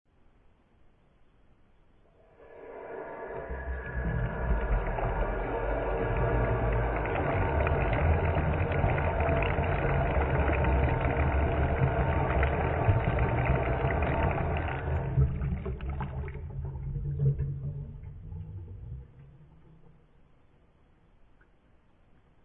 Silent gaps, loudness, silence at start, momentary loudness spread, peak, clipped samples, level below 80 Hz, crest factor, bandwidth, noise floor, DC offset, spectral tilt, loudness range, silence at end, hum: none; -30 LUFS; 2.4 s; 14 LU; -12 dBFS; under 0.1%; -36 dBFS; 18 dB; 4 kHz; -62 dBFS; under 0.1%; -11 dB/octave; 16 LU; 2.55 s; none